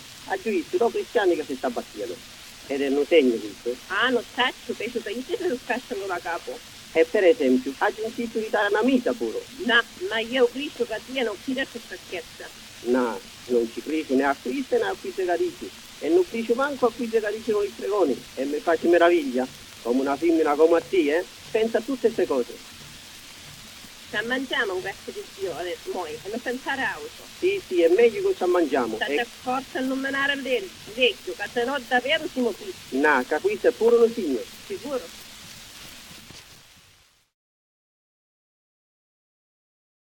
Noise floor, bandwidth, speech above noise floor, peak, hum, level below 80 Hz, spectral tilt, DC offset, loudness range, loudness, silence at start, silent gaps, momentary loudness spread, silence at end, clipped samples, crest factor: -58 dBFS; 17.5 kHz; 34 dB; -6 dBFS; none; -60 dBFS; -3.5 dB/octave; under 0.1%; 6 LU; -24 LUFS; 0 s; none; 18 LU; 3.5 s; under 0.1%; 20 dB